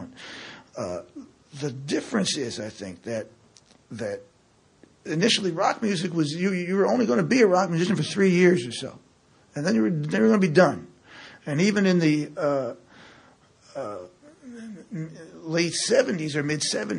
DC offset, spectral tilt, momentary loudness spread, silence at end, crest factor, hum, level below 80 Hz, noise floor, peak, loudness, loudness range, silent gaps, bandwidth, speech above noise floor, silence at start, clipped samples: under 0.1%; -5 dB/octave; 21 LU; 0 s; 22 dB; none; -68 dBFS; -60 dBFS; -4 dBFS; -24 LUFS; 9 LU; none; 11 kHz; 37 dB; 0 s; under 0.1%